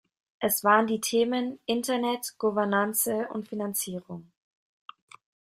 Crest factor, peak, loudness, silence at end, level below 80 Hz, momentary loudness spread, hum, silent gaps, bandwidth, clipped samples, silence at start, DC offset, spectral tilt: 22 dB; -8 dBFS; -27 LUFS; 1.25 s; -72 dBFS; 11 LU; none; none; 16 kHz; under 0.1%; 0.4 s; under 0.1%; -3.5 dB/octave